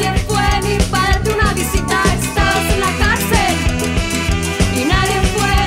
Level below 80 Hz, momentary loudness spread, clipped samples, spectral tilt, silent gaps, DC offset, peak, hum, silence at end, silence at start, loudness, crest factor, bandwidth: -22 dBFS; 3 LU; under 0.1%; -4 dB/octave; none; under 0.1%; -2 dBFS; none; 0 s; 0 s; -15 LUFS; 14 dB; 16.5 kHz